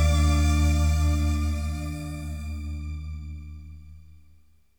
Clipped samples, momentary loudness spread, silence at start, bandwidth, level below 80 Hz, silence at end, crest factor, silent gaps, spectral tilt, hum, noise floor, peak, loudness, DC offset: under 0.1%; 20 LU; 0 s; 18 kHz; -28 dBFS; 0.75 s; 14 dB; none; -6 dB/octave; none; -59 dBFS; -12 dBFS; -26 LUFS; 0.3%